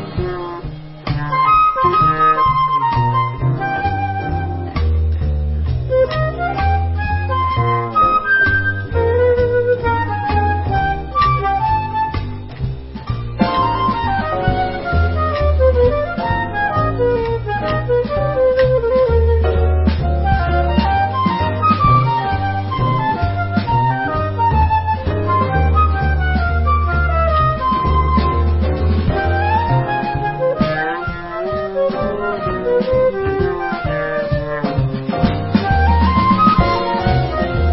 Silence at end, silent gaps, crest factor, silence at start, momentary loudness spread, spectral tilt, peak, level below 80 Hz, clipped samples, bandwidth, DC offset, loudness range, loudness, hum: 0 s; none; 16 dB; 0 s; 7 LU; -12 dB/octave; 0 dBFS; -22 dBFS; under 0.1%; 5.8 kHz; under 0.1%; 3 LU; -16 LUFS; none